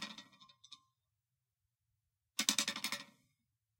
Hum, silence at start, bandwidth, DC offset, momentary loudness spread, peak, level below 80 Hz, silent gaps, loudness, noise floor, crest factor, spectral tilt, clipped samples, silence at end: none; 0 s; 16.5 kHz; under 0.1%; 25 LU; -10 dBFS; under -90 dBFS; none; -37 LUFS; -89 dBFS; 36 dB; 0.5 dB/octave; under 0.1%; 0.75 s